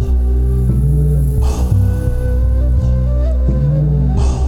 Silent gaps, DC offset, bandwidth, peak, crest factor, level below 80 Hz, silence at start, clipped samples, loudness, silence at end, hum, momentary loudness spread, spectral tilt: none; under 0.1%; 11.5 kHz; -2 dBFS; 12 dB; -14 dBFS; 0 s; under 0.1%; -15 LUFS; 0 s; none; 2 LU; -8.5 dB/octave